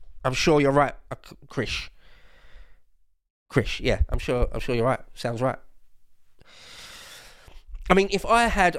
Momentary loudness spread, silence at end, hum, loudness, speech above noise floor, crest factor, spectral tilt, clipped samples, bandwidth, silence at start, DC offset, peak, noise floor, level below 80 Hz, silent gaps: 22 LU; 0 s; none; -24 LUFS; 35 dB; 24 dB; -5 dB/octave; under 0.1%; 15 kHz; 0 s; under 0.1%; -2 dBFS; -58 dBFS; -36 dBFS; 3.30-3.46 s